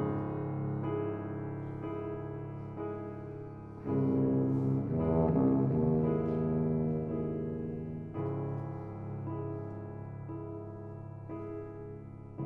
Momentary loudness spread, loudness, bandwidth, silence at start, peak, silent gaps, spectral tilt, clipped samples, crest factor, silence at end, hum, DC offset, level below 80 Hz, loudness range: 14 LU; -34 LUFS; 3.1 kHz; 0 s; -16 dBFS; none; -12 dB/octave; under 0.1%; 16 dB; 0 s; none; under 0.1%; -54 dBFS; 11 LU